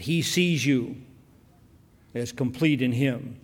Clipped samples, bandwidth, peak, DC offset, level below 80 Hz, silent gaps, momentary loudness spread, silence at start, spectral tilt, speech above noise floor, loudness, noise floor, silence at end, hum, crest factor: under 0.1%; 17.5 kHz; -10 dBFS; under 0.1%; -60 dBFS; none; 14 LU; 0 s; -5 dB/octave; 31 dB; -25 LUFS; -56 dBFS; 0.05 s; none; 16 dB